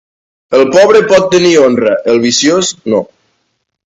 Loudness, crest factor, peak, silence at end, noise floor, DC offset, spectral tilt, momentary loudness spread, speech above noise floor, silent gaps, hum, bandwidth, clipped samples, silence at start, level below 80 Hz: -9 LUFS; 10 dB; 0 dBFS; 0.85 s; -64 dBFS; under 0.1%; -3.5 dB/octave; 9 LU; 56 dB; none; none; 9 kHz; 0.4%; 0.5 s; -50 dBFS